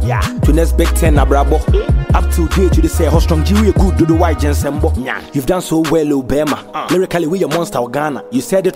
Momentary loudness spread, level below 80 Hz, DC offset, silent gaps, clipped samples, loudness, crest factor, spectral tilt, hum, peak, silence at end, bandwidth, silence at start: 6 LU; -16 dBFS; under 0.1%; none; under 0.1%; -14 LUFS; 12 dB; -6.5 dB/octave; none; 0 dBFS; 0 s; 16.5 kHz; 0 s